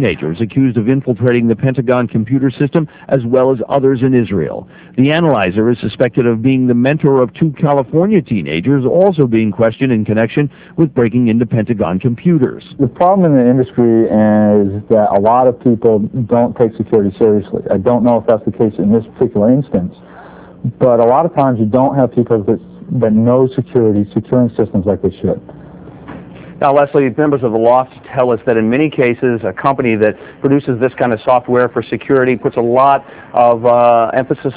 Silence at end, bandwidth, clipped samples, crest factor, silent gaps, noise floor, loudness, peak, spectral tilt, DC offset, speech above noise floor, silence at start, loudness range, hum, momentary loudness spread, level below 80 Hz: 0 s; 4 kHz; 0.1%; 12 dB; none; -33 dBFS; -13 LUFS; 0 dBFS; -12 dB/octave; under 0.1%; 22 dB; 0 s; 3 LU; none; 6 LU; -44 dBFS